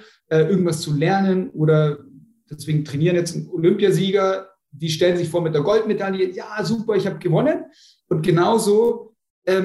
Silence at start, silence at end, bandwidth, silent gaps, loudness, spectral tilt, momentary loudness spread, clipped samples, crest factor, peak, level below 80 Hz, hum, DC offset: 0.3 s; 0 s; 12.5 kHz; 9.30-9.42 s; -20 LUFS; -6.5 dB/octave; 9 LU; under 0.1%; 14 dB; -6 dBFS; -60 dBFS; none; under 0.1%